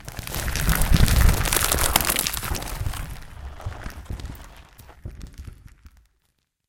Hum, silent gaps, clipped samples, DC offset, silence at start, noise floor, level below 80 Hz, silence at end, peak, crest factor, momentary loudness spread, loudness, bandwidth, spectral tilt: none; none; under 0.1%; under 0.1%; 0 s; -72 dBFS; -28 dBFS; 0.8 s; 0 dBFS; 24 dB; 23 LU; -22 LUFS; 17.5 kHz; -3.5 dB/octave